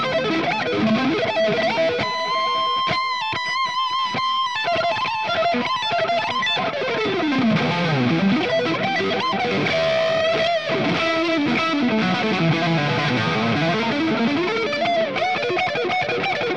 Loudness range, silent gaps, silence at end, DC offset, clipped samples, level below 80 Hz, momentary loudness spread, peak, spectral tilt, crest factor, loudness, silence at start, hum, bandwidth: 1 LU; none; 0 s; 0.3%; under 0.1%; -58 dBFS; 2 LU; -8 dBFS; -5.5 dB/octave; 12 dB; -20 LUFS; 0 s; none; 9.6 kHz